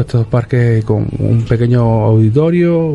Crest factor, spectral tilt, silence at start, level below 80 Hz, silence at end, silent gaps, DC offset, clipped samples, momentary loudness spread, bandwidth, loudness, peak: 10 dB; -10 dB/octave; 0 s; -34 dBFS; 0 s; none; under 0.1%; under 0.1%; 4 LU; 5.2 kHz; -12 LUFS; 0 dBFS